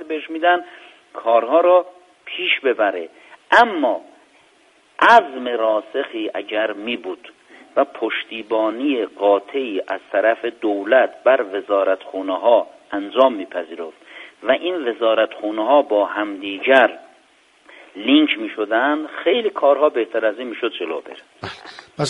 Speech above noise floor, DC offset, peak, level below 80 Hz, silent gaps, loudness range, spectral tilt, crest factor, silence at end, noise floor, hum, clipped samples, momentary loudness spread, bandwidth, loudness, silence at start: 37 dB; under 0.1%; 0 dBFS; -68 dBFS; none; 4 LU; -4.5 dB/octave; 20 dB; 0 s; -55 dBFS; none; under 0.1%; 16 LU; 10 kHz; -18 LUFS; 0 s